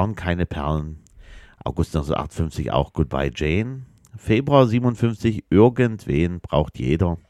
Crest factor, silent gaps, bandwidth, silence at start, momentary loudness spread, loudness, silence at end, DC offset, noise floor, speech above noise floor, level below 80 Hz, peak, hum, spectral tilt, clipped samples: 20 dB; none; 12.5 kHz; 0 s; 11 LU; -21 LUFS; 0.1 s; under 0.1%; -44 dBFS; 24 dB; -36 dBFS; -2 dBFS; none; -8 dB/octave; under 0.1%